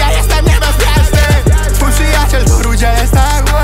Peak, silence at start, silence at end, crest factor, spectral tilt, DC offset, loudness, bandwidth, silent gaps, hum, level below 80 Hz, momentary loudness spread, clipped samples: 0 dBFS; 0 s; 0 s; 8 dB; -4.5 dB/octave; under 0.1%; -11 LUFS; 16.5 kHz; none; 50 Hz at -15 dBFS; -10 dBFS; 2 LU; under 0.1%